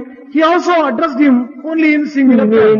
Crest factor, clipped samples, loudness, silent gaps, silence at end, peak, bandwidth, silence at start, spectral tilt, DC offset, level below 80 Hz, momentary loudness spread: 10 dB; under 0.1%; -12 LUFS; none; 0 s; 0 dBFS; 7.2 kHz; 0 s; -6.5 dB/octave; under 0.1%; -58 dBFS; 6 LU